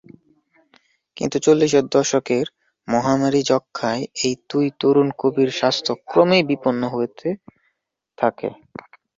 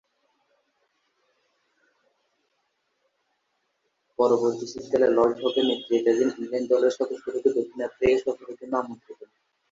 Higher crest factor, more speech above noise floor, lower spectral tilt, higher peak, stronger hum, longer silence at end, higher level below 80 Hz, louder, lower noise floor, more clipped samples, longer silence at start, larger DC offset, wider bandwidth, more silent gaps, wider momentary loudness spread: about the same, 18 dB vs 18 dB; first, 56 dB vs 51 dB; about the same, -4.5 dB/octave vs -5 dB/octave; first, -2 dBFS vs -8 dBFS; neither; about the same, 0.65 s vs 0.6 s; about the same, -62 dBFS vs -62 dBFS; first, -20 LUFS vs -24 LUFS; about the same, -75 dBFS vs -75 dBFS; neither; second, 1.15 s vs 4.2 s; neither; about the same, 7.8 kHz vs 7.8 kHz; neither; about the same, 13 LU vs 11 LU